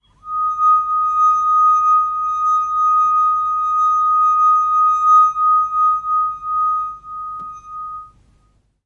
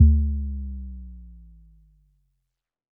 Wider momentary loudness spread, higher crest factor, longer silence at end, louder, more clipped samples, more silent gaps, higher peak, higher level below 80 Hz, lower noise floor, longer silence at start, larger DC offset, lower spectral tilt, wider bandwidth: second, 16 LU vs 24 LU; second, 12 dB vs 20 dB; second, 0.8 s vs 1.65 s; first, -15 LUFS vs -26 LUFS; neither; neither; about the same, -4 dBFS vs -4 dBFS; second, -54 dBFS vs -26 dBFS; second, -58 dBFS vs -80 dBFS; first, 0.25 s vs 0 s; neither; second, -2 dB/octave vs -19 dB/octave; first, 6.6 kHz vs 0.5 kHz